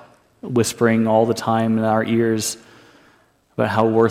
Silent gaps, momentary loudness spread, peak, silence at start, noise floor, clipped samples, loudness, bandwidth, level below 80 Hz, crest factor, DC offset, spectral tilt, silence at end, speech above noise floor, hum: none; 9 LU; -4 dBFS; 0.45 s; -57 dBFS; under 0.1%; -19 LUFS; 16 kHz; -60 dBFS; 16 dB; under 0.1%; -5.5 dB/octave; 0 s; 39 dB; none